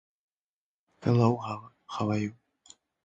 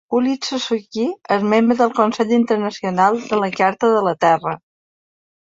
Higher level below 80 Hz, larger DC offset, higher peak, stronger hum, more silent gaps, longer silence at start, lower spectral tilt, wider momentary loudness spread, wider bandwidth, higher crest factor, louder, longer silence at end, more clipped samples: about the same, -62 dBFS vs -64 dBFS; neither; second, -10 dBFS vs -2 dBFS; neither; neither; first, 1 s vs 0.1 s; first, -8 dB/octave vs -5.5 dB/octave; first, 15 LU vs 7 LU; about the same, 7.8 kHz vs 7.8 kHz; first, 22 dB vs 16 dB; second, -29 LUFS vs -18 LUFS; about the same, 0.75 s vs 0.85 s; neither